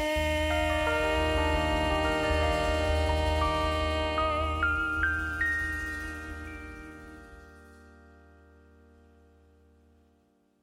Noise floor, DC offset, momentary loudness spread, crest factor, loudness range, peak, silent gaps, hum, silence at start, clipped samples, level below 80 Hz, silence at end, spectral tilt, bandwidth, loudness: -68 dBFS; under 0.1%; 15 LU; 16 dB; 15 LU; -14 dBFS; none; none; 0 s; under 0.1%; -36 dBFS; 2.7 s; -5 dB/octave; 15.5 kHz; -28 LUFS